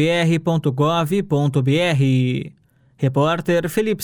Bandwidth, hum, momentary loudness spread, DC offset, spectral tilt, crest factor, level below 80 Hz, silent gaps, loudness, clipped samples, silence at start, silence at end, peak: 19 kHz; none; 5 LU; under 0.1%; -6.5 dB/octave; 12 dB; -56 dBFS; none; -19 LUFS; under 0.1%; 0 s; 0 s; -6 dBFS